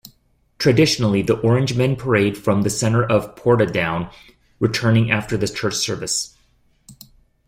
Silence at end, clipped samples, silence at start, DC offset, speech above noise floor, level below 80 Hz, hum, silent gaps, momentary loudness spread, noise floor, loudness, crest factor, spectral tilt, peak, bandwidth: 0.55 s; under 0.1%; 0.05 s; under 0.1%; 42 dB; -48 dBFS; none; none; 7 LU; -60 dBFS; -19 LUFS; 16 dB; -5 dB/octave; -2 dBFS; 16 kHz